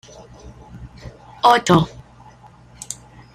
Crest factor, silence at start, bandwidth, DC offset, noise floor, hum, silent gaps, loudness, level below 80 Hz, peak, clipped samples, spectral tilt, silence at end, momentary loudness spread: 20 dB; 0.75 s; 15.5 kHz; under 0.1%; -46 dBFS; none; none; -16 LUFS; -46 dBFS; -2 dBFS; under 0.1%; -5 dB/octave; 0.4 s; 26 LU